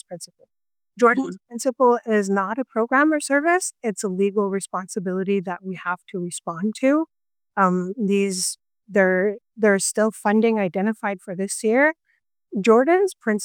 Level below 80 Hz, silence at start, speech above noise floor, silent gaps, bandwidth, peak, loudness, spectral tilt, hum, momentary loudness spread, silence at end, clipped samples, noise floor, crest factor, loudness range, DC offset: -78 dBFS; 0.1 s; 49 dB; none; 17.5 kHz; -4 dBFS; -21 LUFS; -5 dB/octave; none; 11 LU; 0 s; under 0.1%; -70 dBFS; 18 dB; 4 LU; under 0.1%